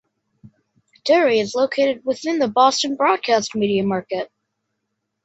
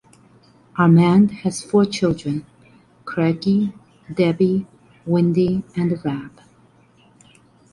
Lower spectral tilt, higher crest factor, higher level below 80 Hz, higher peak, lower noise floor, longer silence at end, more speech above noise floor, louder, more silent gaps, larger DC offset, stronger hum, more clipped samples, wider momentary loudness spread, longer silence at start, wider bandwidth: second, -4 dB/octave vs -7.5 dB/octave; about the same, 18 dB vs 16 dB; second, -66 dBFS vs -54 dBFS; about the same, -2 dBFS vs -4 dBFS; first, -76 dBFS vs -54 dBFS; second, 1 s vs 1.45 s; first, 58 dB vs 36 dB; about the same, -19 LUFS vs -19 LUFS; neither; neither; neither; neither; second, 10 LU vs 16 LU; first, 1.05 s vs 0.75 s; second, 8.2 kHz vs 11.5 kHz